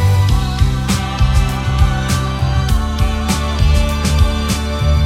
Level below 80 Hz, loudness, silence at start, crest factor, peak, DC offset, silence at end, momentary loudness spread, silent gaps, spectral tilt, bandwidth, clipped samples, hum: -16 dBFS; -16 LUFS; 0 s; 14 dB; 0 dBFS; under 0.1%; 0 s; 3 LU; none; -5.5 dB/octave; 15.5 kHz; under 0.1%; none